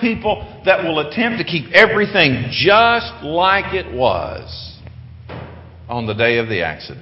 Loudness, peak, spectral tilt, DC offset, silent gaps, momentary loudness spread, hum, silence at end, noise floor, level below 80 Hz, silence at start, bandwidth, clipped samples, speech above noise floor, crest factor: -15 LUFS; 0 dBFS; -6.5 dB/octave; under 0.1%; none; 20 LU; none; 0 s; -36 dBFS; -40 dBFS; 0 s; 8 kHz; under 0.1%; 20 dB; 18 dB